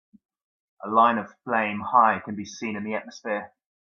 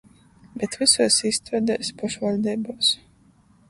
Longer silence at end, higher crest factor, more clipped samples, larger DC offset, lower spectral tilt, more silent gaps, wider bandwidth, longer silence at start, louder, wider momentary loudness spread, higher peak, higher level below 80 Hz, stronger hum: second, 0.5 s vs 0.75 s; about the same, 22 dB vs 22 dB; neither; neither; first, -5 dB/octave vs -2.5 dB/octave; neither; second, 7.2 kHz vs 11.5 kHz; first, 0.8 s vs 0.55 s; about the same, -24 LUFS vs -22 LUFS; about the same, 12 LU vs 13 LU; about the same, -4 dBFS vs -2 dBFS; second, -74 dBFS vs -60 dBFS; neither